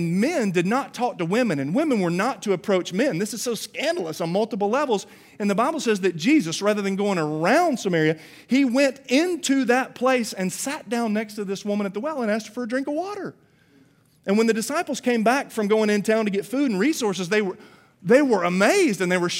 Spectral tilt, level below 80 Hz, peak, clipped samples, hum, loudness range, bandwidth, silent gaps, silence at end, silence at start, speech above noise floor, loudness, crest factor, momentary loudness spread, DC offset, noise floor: -5 dB/octave; -74 dBFS; -4 dBFS; under 0.1%; none; 5 LU; 16 kHz; none; 0 s; 0 s; 35 dB; -23 LUFS; 18 dB; 8 LU; under 0.1%; -57 dBFS